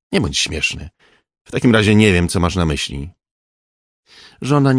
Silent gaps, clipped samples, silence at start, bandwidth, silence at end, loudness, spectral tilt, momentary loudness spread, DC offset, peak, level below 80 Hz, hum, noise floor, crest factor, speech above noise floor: 1.41-1.45 s, 3.31-4.03 s; under 0.1%; 0.1 s; 10.5 kHz; 0 s; -16 LUFS; -5 dB/octave; 17 LU; under 0.1%; 0 dBFS; -36 dBFS; none; under -90 dBFS; 18 dB; over 74 dB